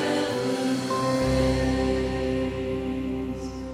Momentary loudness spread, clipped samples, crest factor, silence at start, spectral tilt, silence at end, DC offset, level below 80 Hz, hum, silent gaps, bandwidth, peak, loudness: 7 LU; under 0.1%; 14 dB; 0 s; -6 dB/octave; 0 s; under 0.1%; -38 dBFS; none; none; 15 kHz; -12 dBFS; -26 LUFS